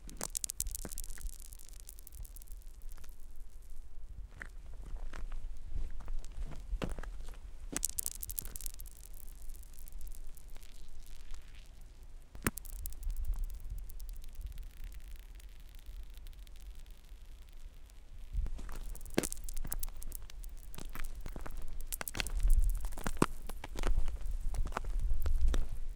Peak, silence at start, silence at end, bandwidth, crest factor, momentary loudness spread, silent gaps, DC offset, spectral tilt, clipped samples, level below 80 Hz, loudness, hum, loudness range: -6 dBFS; 0 s; 0 s; 18 kHz; 30 dB; 19 LU; none; under 0.1%; -4 dB/octave; under 0.1%; -38 dBFS; -42 LUFS; none; 14 LU